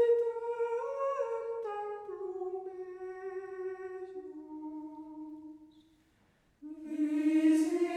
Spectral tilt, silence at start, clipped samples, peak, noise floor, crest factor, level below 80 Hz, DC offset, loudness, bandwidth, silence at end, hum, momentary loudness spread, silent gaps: -4.5 dB/octave; 0 s; under 0.1%; -18 dBFS; -69 dBFS; 16 dB; -78 dBFS; under 0.1%; -35 LUFS; 12 kHz; 0 s; none; 19 LU; none